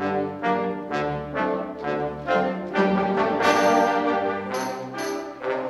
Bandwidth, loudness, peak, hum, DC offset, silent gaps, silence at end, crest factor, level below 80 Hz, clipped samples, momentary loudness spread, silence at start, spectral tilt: 13 kHz; -24 LUFS; -4 dBFS; none; under 0.1%; none; 0 s; 20 dB; -54 dBFS; under 0.1%; 10 LU; 0 s; -5.5 dB/octave